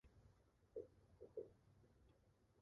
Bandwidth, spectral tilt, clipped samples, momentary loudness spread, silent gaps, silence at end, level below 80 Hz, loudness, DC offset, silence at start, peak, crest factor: 6.6 kHz; -8 dB/octave; under 0.1%; 7 LU; none; 0 s; -78 dBFS; -60 LUFS; under 0.1%; 0.05 s; -42 dBFS; 22 dB